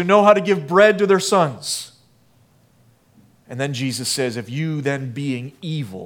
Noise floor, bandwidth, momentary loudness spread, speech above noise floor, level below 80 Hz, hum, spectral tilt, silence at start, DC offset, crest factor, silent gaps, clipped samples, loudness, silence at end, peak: -56 dBFS; 18 kHz; 14 LU; 37 dB; -68 dBFS; none; -4.5 dB/octave; 0 s; under 0.1%; 20 dB; none; under 0.1%; -19 LUFS; 0 s; 0 dBFS